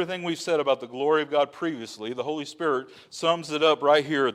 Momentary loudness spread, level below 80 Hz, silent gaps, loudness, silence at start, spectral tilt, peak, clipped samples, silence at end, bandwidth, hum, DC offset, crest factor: 10 LU; -76 dBFS; none; -25 LUFS; 0 s; -4 dB/octave; -8 dBFS; under 0.1%; 0 s; 13 kHz; none; under 0.1%; 18 dB